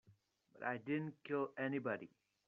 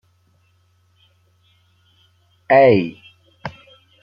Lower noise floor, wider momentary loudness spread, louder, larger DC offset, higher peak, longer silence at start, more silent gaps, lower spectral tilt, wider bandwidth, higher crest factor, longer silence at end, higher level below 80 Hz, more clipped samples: first, -73 dBFS vs -60 dBFS; second, 6 LU vs 23 LU; second, -43 LUFS vs -15 LUFS; neither; second, -26 dBFS vs -2 dBFS; second, 0.1 s vs 2.5 s; neither; second, -5.5 dB/octave vs -8.5 dB/octave; second, 5 kHz vs 5.6 kHz; about the same, 18 dB vs 20 dB; about the same, 0.4 s vs 0.5 s; second, -88 dBFS vs -62 dBFS; neither